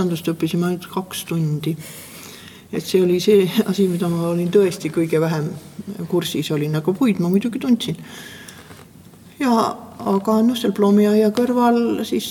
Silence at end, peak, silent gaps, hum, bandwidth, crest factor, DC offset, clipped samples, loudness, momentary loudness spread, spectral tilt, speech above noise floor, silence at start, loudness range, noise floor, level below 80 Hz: 0 s; -4 dBFS; none; none; 19 kHz; 16 dB; under 0.1%; under 0.1%; -19 LUFS; 18 LU; -6.5 dB/octave; 26 dB; 0 s; 4 LU; -44 dBFS; -62 dBFS